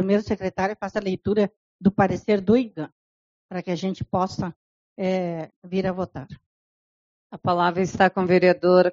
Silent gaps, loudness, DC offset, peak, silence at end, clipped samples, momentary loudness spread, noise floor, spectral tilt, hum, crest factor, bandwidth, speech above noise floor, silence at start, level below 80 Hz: 1.56-1.79 s, 2.92-3.49 s, 4.56-4.96 s, 5.56-5.62 s, 6.46-7.30 s; -23 LUFS; under 0.1%; -4 dBFS; 0 s; under 0.1%; 15 LU; under -90 dBFS; -5.5 dB/octave; none; 20 dB; 7.4 kHz; over 68 dB; 0 s; -54 dBFS